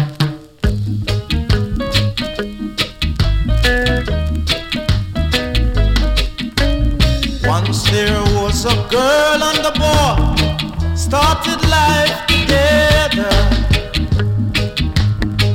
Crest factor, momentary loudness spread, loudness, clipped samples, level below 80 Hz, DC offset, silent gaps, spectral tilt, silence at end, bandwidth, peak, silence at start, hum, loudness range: 14 dB; 7 LU; -15 LUFS; under 0.1%; -20 dBFS; under 0.1%; none; -5 dB/octave; 0 s; 16.5 kHz; 0 dBFS; 0 s; none; 4 LU